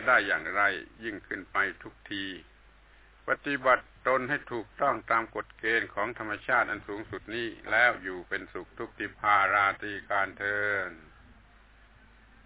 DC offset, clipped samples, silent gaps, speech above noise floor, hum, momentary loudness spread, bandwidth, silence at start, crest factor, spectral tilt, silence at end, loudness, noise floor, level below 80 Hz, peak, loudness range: under 0.1%; under 0.1%; none; 28 dB; none; 15 LU; 4 kHz; 0 s; 20 dB; -1.5 dB/octave; 1.45 s; -29 LUFS; -57 dBFS; -60 dBFS; -10 dBFS; 4 LU